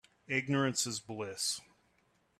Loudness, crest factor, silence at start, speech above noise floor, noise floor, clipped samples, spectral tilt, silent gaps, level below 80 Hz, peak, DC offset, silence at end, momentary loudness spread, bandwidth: -34 LUFS; 20 dB; 0.3 s; 38 dB; -73 dBFS; under 0.1%; -3 dB/octave; none; -74 dBFS; -18 dBFS; under 0.1%; 0.8 s; 10 LU; 15 kHz